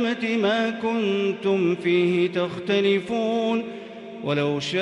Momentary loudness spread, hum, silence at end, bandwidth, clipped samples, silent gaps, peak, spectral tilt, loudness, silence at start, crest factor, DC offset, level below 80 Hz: 7 LU; none; 0 s; 10.5 kHz; under 0.1%; none; -10 dBFS; -6 dB/octave; -23 LUFS; 0 s; 14 dB; under 0.1%; -68 dBFS